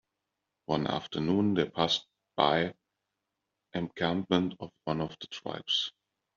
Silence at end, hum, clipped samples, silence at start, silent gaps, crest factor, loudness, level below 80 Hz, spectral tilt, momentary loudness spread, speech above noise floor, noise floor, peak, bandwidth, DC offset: 0.45 s; none; under 0.1%; 0.7 s; none; 24 dB; -31 LUFS; -66 dBFS; -3.5 dB/octave; 12 LU; 55 dB; -85 dBFS; -8 dBFS; 7.4 kHz; under 0.1%